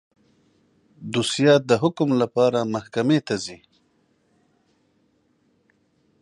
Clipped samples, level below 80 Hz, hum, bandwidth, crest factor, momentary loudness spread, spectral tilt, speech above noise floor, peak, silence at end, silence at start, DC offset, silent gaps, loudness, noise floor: under 0.1%; -66 dBFS; none; 11 kHz; 20 dB; 11 LU; -5.5 dB/octave; 45 dB; -4 dBFS; 2.65 s; 1 s; under 0.1%; none; -21 LUFS; -65 dBFS